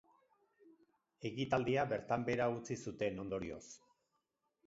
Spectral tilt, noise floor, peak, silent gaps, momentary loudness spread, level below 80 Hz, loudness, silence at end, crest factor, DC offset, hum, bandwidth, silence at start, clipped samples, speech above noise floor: -5 dB/octave; -85 dBFS; -20 dBFS; none; 13 LU; -68 dBFS; -39 LUFS; 0.9 s; 22 dB; under 0.1%; none; 7.6 kHz; 0.65 s; under 0.1%; 46 dB